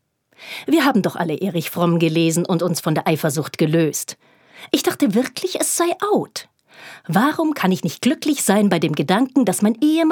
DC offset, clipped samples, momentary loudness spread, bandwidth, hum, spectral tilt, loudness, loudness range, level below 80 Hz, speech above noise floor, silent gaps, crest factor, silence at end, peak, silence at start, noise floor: under 0.1%; under 0.1%; 6 LU; 19.5 kHz; none; -5 dB/octave; -19 LUFS; 2 LU; -70 dBFS; 26 dB; none; 18 dB; 0 s; -2 dBFS; 0.4 s; -44 dBFS